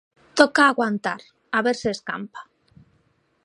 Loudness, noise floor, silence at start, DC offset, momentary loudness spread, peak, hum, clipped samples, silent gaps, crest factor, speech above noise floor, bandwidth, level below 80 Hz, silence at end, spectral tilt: -21 LUFS; -65 dBFS; 0.35 s; under 0.1%; 19 LU; 0 dBFS; none; under 0.1%; none; 24 dB; 44 dB; 11 kHz; -62 dBFS; 1 s; -4 dB/octave